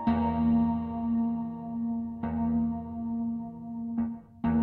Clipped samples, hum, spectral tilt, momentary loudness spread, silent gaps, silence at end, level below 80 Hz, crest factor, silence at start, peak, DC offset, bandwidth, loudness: under 0.1%; none; -11 dB/octave; 10 LU; none; 0 s; -48 dBFS; 14 dB; 0 s; -16 dBFS; under 0.1%; 4.2 kHz; -31 LUFS